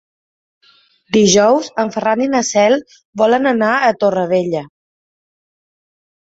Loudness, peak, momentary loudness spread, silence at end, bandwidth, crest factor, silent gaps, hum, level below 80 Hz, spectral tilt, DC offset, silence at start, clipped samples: -14 LUFS; 0 dBFS; 8 LU; 1.55 s; 8 kHz; 16 dB; 3.05-3.13 s; none; -56 dBFS; -4 dB/octave; under 0.1%; 1.1 s; under 0.1%